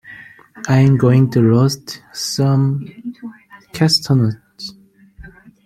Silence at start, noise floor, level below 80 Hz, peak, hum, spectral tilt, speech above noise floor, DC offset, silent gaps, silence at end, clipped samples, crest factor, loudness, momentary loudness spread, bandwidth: 0.1 s; -45 dBFS; -50 dBFS; -2 dBFS; none; -6 dB/octave; 31 dB; under 0.1%; none; 0.35 s; under 0.1%; 14 dB; -15 LUFS; 20 LU; 14.5 kHz